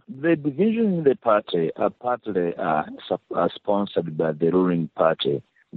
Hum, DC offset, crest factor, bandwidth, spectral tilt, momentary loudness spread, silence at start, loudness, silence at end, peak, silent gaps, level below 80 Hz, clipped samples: none; under 0.1%; 18 dB; 4.7 kHz; -5.5 dB/octave; 6 LU; 0.1 s; -23 LUFS; 0 s; -6 dBFS; none; -64 dBFS; under 0.1%